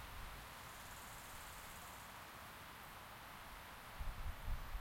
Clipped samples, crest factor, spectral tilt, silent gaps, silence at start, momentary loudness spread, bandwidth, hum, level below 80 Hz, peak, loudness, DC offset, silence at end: under 0.1%; 18 dB; -3 dB/octave; none; 0 s; 4 LU; 16.5 kHz; none; -52 dBFS; -32 dBFS; -53 LUFS; under 0.1%; 0 s